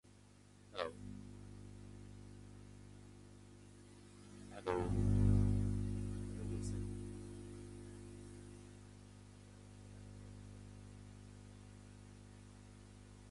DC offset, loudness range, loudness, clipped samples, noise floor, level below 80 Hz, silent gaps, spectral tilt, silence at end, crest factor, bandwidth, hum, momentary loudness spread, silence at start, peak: under 0.1%; 18 LU; -41 LUFS; under 0.1%; -63 dBFS; -50 dBFS; none; -7.5 dB/octave; 0 s; 22 dB; 11.5 kHz; 50 Hz at -45 dBFS; 22 LU; 0.05 s; -22 dBFS